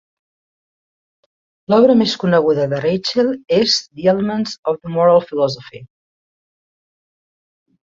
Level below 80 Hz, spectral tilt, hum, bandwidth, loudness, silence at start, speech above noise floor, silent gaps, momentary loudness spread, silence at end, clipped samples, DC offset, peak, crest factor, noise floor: -58 dBFS; -5.5 dB/octave; none; 7.8 kHz; -16 LUFS; 1.7 s; over 74 dB; 4.58-4.63 s; 8 LU; 2.05 s; under 0.1%; under 0.1%; -2 dBFS; 16 dB; under -90 dBFS